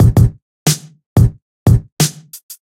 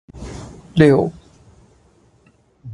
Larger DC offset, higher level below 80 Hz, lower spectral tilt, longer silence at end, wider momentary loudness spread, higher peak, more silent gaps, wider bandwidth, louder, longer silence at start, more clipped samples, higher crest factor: neither; first, -24 dBFS vs -44 dBFS; second, -5.5 dB/octave vs -8 dB/octave; first, 0.15 s vs 0 s; second, 7 LU vs 22 LU; about the same, 0 dBFS vs 0 dBFS; first, 0.42-0.66 s, 1.06-1.16 s, 1.42-1.66 s, 1.92-1.97 s, 2.43-2.49 s vs none; first, 16.5 kHz vs 11 kHz; about the same, -15 LUFS vs -16 LUFS; second, 0 s vs 0.15 s; neither; second, 14 dB vs 20 dB